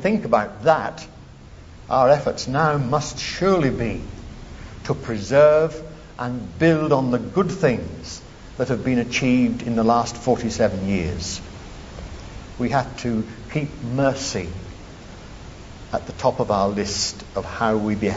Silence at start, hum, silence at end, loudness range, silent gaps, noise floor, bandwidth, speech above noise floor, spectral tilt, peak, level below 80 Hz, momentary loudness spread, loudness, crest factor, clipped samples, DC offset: 0 s; none; 0 s; 6 LU; none; -42 dBFS; 8 kHz; 21 dB; -5.5 dB/octave; -2 dBFS; -42 dBFS; 20 LU; -21 LUFS; 20 dB; under 0.1%; under 0.1%